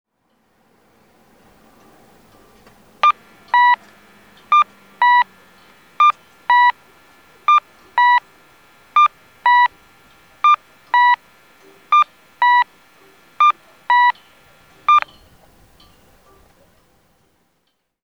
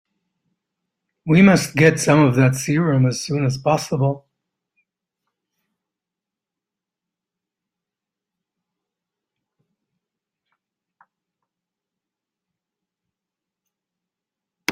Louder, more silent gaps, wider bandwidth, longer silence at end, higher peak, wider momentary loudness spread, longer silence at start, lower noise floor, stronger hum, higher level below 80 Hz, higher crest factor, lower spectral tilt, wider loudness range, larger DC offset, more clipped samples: about the same, -15 LUFS vs -17 LUFS; neither; second, 7.6 kHz vs 15 kHz; first, 3.05 s vs 0 s; about the same, 0 dBFS vs -2 dBFS; about the same, 9 LU vs 9 LU; first, 3.05 s vs 1.25 s; second, -69 dBFS vs -87 dBFS; neither; second, -64 dBFS vs -58 dBFS; about the same, 18 dB vs 22 dB; second, -0.5 dB/octave vs -6 dB/octave; second, 5 LU vs 13 LU; first, 0.1% vs under 0.1%; neither